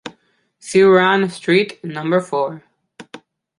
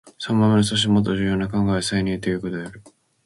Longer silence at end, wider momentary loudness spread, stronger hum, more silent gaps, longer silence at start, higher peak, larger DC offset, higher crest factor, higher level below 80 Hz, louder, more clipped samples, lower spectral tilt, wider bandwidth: about the same, 0.45 s vs 0.45 s; first, 14 LU vs 11 LU; neither; neither; about the same, 0.05 s vs 0.05 s; first, -2 dBFS vs -6 dBFS; neither; about the same, 16 dB vs 14 dB; second, -62 dBFS vs -46 dBFS; first, -16 LUFS vs -21 LUFS; neither; about the same, -5.5 dB/octave vs -5.5 dB/octave; about the same, 11.5 kHz vs 11.5 kHz